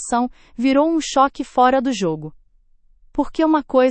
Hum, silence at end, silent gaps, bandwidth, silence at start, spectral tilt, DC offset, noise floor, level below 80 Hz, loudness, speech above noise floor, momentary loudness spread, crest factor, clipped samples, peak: none; 0 s; none; 8.8 kHz; 0 s; -4.5 dB/octave; under 0.1%; -54 dBFS; -46 dBFS; -19 LUFS; 36 dB; 11 LU; 16 dB; under 0.1%; -2 dBFS